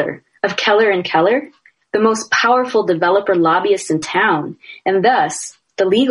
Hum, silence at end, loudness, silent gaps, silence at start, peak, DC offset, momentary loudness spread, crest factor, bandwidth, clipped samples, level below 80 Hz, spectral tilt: none; 0 s; -15 LUFS; none; 0 s; -2 dBFS; under 0.1%; 9 LU; 14 dB; 11.5 kHz; under 0.1%; -64 dBFS; -4 dB/octave